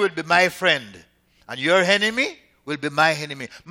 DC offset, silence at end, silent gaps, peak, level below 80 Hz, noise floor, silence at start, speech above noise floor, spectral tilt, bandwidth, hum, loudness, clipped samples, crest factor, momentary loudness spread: under 0.1%; 0 s; none; -2 dBFS; -64 dBFS; -50 dBFS; 0 s; 29 dB; -3.5 dB/octave; 17 kHz; none; -20 LUFS; under 0.1%; 20 dB; 15 LU